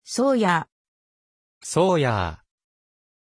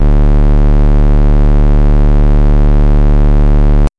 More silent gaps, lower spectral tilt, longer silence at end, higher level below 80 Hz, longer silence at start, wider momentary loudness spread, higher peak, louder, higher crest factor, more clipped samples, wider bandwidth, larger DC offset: first, 0.72-1.61 s vs none; second, -5 dB/octave vs -9.5 dB/octave; first, 1 s vs 0.1 s; second, -52 dBFS vs -6 dBFS; about the same, 0.05 s vs 0 s; first, 15 LU vs 0 LU; second, -8 dBFS vs -4 dBFS; second, -22 LUFS vs -11 LUFS; first, 18 dB vs 2 dB; neither; first, 10.5 kHz vs 3.4 kHz; neither